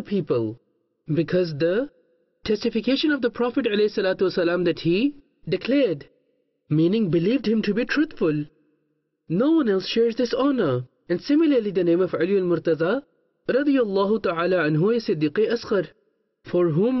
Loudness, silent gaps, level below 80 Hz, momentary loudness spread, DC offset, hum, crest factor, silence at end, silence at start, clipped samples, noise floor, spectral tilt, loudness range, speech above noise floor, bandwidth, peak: -22 LUFS; none; -58 dBFS; 8 LU; under 0.1%; none; 12 dB; 0 s; 0 s; under 0.1%; -72 dBFS; -7.5 dB/octave; 2 LU; 51 dB; 6.2 kHz; -12 dBFS